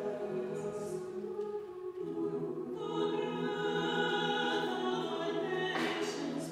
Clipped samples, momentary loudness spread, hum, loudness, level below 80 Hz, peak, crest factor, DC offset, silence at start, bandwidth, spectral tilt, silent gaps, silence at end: under 0.1%; 8 LU; none; -36 LUFS; -76 dBFS; -20 dBFS; 16 dB; under 0.1%; 0 s; 14.5 kHz; -4.5 dB/octave; none; 0 s